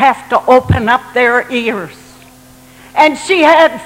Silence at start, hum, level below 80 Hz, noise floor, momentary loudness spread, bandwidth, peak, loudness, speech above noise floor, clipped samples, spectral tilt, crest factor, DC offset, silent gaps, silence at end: 0 s; none; -38 dBFS; -40 dBFS; 11 LU; 16.5 kHz; 0 dBFS; -11 LUFS; 29 dB; 0.2%; -5 dB/octave; 12 dB; under 0.1%; none; 0 s